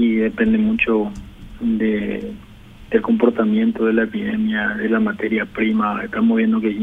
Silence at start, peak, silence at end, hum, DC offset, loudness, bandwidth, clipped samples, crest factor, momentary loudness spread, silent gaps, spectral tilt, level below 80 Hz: 0 s; 0 dBFS; 0 s; none; under 0.1%; -19 LUFS; 3.9 kHz; under 0.1%; 18 dB; 9 LU; none; -8 dB/octave; -44 dBFS